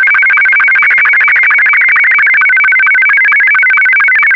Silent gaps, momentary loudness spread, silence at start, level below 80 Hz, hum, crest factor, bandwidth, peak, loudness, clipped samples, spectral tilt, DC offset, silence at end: none; 0 LU; 0 s; -56 dBFS; none; 4 dB; 6.8 kHz; -4 dBFS; -5 LUFS; under 0.1%; -1 dB/octave; under 0.1%; 0 s